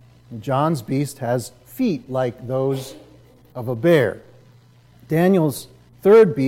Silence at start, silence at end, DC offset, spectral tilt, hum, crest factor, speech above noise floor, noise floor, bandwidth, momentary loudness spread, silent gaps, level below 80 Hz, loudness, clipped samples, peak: 0.3 s; 0 s; under 0.1%; -7 dB/octave; none; 16 dB; 32 dB; -51 dBFS; 16.5 kHz; 18 LU; none; -58 dBFS; -20 LUFS; under 0.1%; -4 dBFS